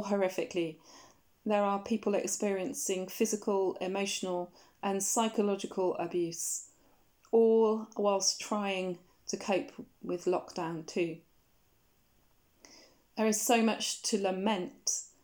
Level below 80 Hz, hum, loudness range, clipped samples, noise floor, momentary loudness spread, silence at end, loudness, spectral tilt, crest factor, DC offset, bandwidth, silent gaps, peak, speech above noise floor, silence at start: -76 dBFS; none; 6 LU; under 0.1%; -70 dBFS; 11 LU; 0.15 s; -32 LUFS; -3.5 dB/octave; 20 dB; under 0.1%; over 20 kHz; none; -14 dBFS; 38 dB; 0 s